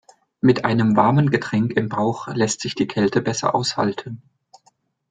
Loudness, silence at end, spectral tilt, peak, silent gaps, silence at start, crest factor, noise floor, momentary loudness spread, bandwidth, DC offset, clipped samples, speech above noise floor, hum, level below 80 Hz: -20 LUFS; 0.95 s; -5.5 dB/octave; -2 dBFS; none; 0.45 s; 18 dB; -62 dBFS; 7 LU; 9.4 kHz; under 0.1%; under 0.1%; 42 dB; none; -56 dBFS